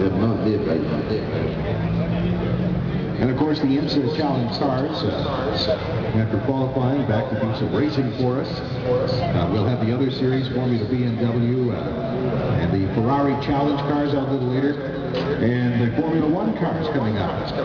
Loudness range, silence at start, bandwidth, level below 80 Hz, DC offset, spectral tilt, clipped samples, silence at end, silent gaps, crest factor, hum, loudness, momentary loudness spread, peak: 1 LU; 0 s; 6.8 kHz; -40 dBFS; under 0.1%; -6.5 dB/octave; under 0.1%; 0 s; none; 12 dB; none; -22 LUFS; 4 LU; -8 dBFS